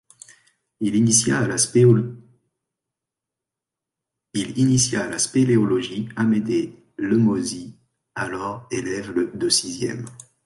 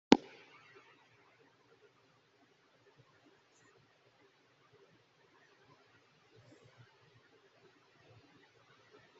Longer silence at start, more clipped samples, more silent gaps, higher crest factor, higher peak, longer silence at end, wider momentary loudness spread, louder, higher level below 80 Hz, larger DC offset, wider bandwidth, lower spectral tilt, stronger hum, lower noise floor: first, 0.8 s vs 0.1 s; neither; neither; second, 18 dB vs 38 dB; about the same, -4 dBFS vs -4 dBFS; second, 0.3 s vs 9.05 s; first, 14 LU vs 9 LU; first, -21 LUFS vs -30 LUFS; first, -56 dBFS vs -74 dBFS; neither; first, 11.5 kHz vs 7.6 kHz; about the same, -4.5 dB/octave vs -3.5 dB/octave; neither; first, -87 dBFS vs -70 dBFS